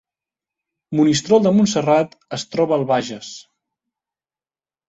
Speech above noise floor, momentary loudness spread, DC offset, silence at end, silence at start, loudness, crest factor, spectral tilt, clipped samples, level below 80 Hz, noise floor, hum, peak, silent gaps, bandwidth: over 73 dB; 16 LU; under 0.1%; 1.45 s; 0.9 s; -17 LUFS; 18 dB; -5.5 dB/octave; under 0.1%; -60 dBFS; under -90 dBFS; none; -2 dBFS; none; 8.2 kHz